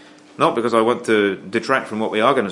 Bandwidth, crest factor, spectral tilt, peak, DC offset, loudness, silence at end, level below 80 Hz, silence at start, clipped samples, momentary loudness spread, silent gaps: 11.5 kHz; 18 dB; -5 dB/octave; 0 dBFS; under 0.1%; -19 LUFS; 0 s; -70 dBFS; 0.4 s; under 0.1%; 4 LU; none